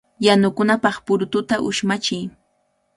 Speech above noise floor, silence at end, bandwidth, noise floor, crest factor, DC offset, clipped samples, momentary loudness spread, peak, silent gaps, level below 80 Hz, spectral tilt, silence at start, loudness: 48 dB; 0.65 s; 11.5 kHz; -67 dBFS; 20 dB; under 0.1%; under 0.1%; 8 LU; 0 dBFS; none; -58 dBFS; -4.5 dB/octave; 0.2 s; -19 LUFS